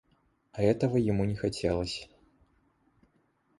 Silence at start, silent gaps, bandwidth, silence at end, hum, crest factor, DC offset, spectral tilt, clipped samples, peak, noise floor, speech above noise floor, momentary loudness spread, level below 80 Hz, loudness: 0.55 s; none; 11.5 kHz; 1.55 s; none; 20 dB; under 0.1%; -7 dB/octave; under 0.1%; -12 dBFS; -71 dBFS; 42 dB; 10 LU; -52 dBFS; -30 LUFS